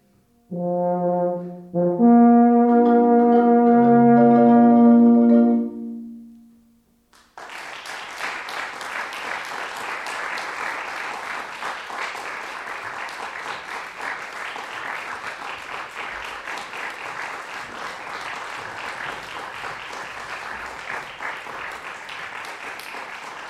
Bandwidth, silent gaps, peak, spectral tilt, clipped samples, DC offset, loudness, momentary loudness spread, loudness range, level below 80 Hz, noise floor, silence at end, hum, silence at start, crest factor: 12 kHz; none; -4 dBFS; -6 dB/octave; under 0.1%; under 0.1%; -21 LUFS; 19 LU; 17 LU; -64 dBFS; -59 dBFS; 0 s; none; 0.5 s; 16 dB